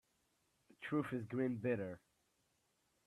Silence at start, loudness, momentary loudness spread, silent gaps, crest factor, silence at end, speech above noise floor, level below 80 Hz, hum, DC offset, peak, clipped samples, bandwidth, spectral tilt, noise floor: 0.8 s; -41 LUFS; 12 LU; none; 18 dB; 1.1 s; 41 dB; -80 dBFS; none; under 0.1%; -26 dBFS; under 0.1%; 13 kHz; -8 dB/octave; -81 dBFS